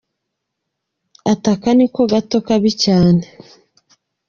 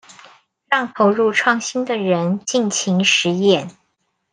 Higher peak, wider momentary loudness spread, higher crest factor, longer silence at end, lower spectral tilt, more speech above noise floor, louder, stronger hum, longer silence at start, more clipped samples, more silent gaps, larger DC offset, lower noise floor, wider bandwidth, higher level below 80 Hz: about the same, 0 dBFS vs 0 dBFS; about the same, 6 LU vs 6 LU; about the same, 16 dB vs 18 dB; first, 1.05 s vs 0.6 s; first, -6.5 dB/octave vs -4 dB/octave; first, 63 dB vs 52 dB; about the same, -15 LUFS vs -17 LUFS; neither; first, 1.25 s vs 0.1 s; neither; neither; neither; first, -77 dBFS vs -69 dBFS; second, 7.4 kHz vs 10 kHz; first, -48 dBFS vs -68 dBFS